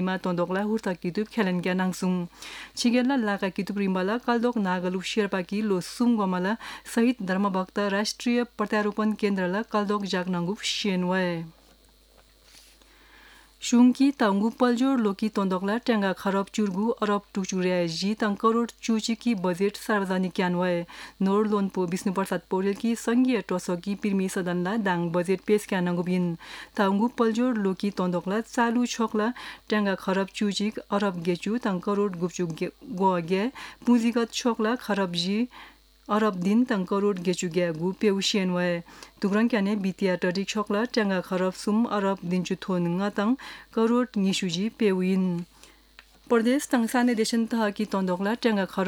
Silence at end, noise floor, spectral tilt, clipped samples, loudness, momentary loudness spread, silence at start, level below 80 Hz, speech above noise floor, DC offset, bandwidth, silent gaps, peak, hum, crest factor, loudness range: 0 s; -57 dBFS; -5.5 dB/octave; under 0.1%; -26 LUFS; 6 LU; 0 s; -62 dBFS; 32 dB; under 0.1%; 17 kHz; none; -10 dBFS; none; 16 dB; 2 LU